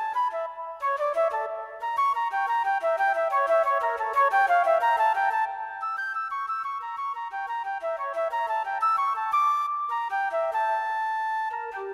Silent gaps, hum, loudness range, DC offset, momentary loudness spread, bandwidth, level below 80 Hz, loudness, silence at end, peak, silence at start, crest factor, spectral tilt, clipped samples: none; 50 Hz at -75 dBFS; 5 LU; under 0.1%; 10 LU; 14 kHz; -72 dBFS; -26 LUFS; 0 s; -12 dBFS; 0 s; 14 dB; -1 dB/octave; under 0.1%